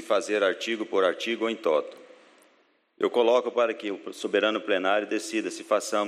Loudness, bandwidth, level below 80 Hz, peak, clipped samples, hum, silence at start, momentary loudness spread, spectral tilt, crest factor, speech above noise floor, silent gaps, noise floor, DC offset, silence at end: -26 LUFS; 14.5 kHz; -84 dBFS; -10 dBFS; under 0.1%; none; 0 s; 7 LU; -3 dB/octave; 18 dB; 39 dB; none; -65 dBFS; under 0.1%; 0 s